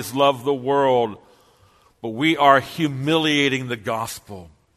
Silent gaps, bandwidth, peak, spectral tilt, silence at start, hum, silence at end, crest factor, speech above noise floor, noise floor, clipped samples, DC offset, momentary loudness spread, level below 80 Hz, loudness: none; 13.5 kHz; 0 dBFS; -5 dB/octave; 0 s; none; 0.3 s; 20 dB; 36 dB; -56 dBFS; under 0.1%; under 0.1%; 17 LU; -60 dBFS; -20 LUFS